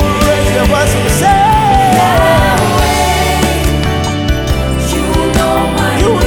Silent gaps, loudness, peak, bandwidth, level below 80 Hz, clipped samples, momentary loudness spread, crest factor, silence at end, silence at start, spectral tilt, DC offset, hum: none; -11 LUFS; 0 dBFS; 20 kHz; -18 dBFS; under 0.1%; 5 LU; 10 dB; 0 s; 0 s; -5 dB/octave; under 0.1%; none